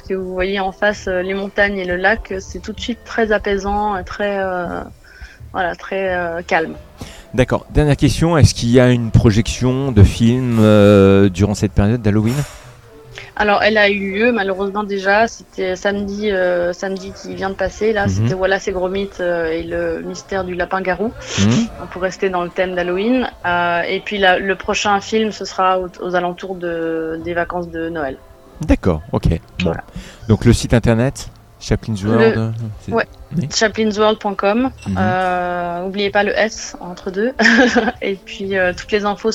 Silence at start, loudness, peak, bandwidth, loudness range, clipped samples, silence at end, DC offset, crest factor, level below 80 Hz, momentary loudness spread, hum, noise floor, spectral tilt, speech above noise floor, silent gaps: 0.05 s; -17 LUFS; 0 dBFS; 14.5 kHz; 8 LU; under 0.1%; 0 s; under 0.1%; 16 dB; -32 dBFS; 12 LU; none; -40 dBFS; -6 dB/octave; 23 dB; none